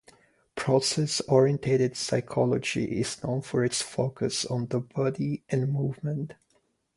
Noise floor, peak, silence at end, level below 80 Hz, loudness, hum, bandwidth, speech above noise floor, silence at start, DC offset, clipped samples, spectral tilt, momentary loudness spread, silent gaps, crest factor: -70 dBFS; -8 dBFS; 0.65 s; -62 dBFS; -27 LUFS; none; 11.5 kHz; 43 dB; 0.55 s; under 0.1%; under 0.1%; -5 dB/octave; 8 LU; none; 20 dB